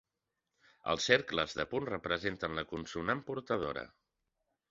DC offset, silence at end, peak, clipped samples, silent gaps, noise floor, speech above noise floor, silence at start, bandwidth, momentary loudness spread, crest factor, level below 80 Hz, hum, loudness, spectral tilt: under 0.1%; 0.85 s; -8 dBFS; under 0.1%; none; -88 dBFS; 53 dB; 0.85 s; 7.6 kHz; 11 LU; 28 dB; -62 dBFS; none; -35 LUFS; -2 dB/octave